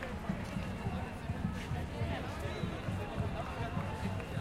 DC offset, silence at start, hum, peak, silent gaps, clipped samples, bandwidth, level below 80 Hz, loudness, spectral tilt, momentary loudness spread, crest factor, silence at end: under 0.1%; 0 s; none; -24 dBFS; none; under 0.1%; 15.5 kHz; -48 dBFS; -39 LUFS; -6.5 dB/octave; 2 LU; 14 dB; 0 s